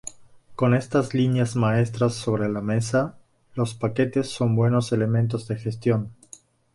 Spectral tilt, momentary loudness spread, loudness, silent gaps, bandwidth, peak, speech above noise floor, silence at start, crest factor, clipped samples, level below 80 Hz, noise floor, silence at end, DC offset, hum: -7 dB/octave; 8 LU; -24 LUFS; none; 11.5 kHz; -8 dBFS; 28 dB; 0.05 s; 16 dB; under 0.1%; -56 dBFS; -50 dBFS; 0.6 s; under 0.1%; none